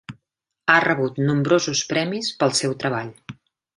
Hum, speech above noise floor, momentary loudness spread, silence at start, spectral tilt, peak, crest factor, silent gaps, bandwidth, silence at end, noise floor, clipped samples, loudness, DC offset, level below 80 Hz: none; 57 dB; 10 LU; 0.1 s; -4 dB/octave; -2 dBFS; 20 dB; none; 11.5 kHz; 0.45 s; -78 dBFS; under 0.1%; -21 LUFS; under 0.1%; -62 dBFS